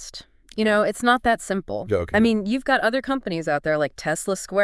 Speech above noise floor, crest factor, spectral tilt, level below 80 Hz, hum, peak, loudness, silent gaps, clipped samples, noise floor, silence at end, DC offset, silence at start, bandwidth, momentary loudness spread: 21 dB; 18 dB; -4.5 dB/octave; -48 dBFS; none; -4 dBFS; -22 LUFS; none; under 0.1%; -43 dBFS; 0 s; under 0.1%; 0 s; 12 kHz; 7 LU